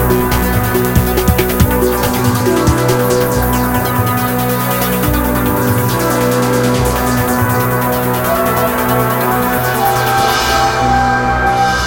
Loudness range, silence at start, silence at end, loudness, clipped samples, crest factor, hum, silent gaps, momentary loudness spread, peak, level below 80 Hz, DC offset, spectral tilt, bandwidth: 1 LU; 0 s; 0 s; -13 LUFS; under 0.1%; 12 dB; none; none; 2 LU; 0 dBFS; -24 dBFS; under 0.1%; -5 dB/octave; 17.5 kHz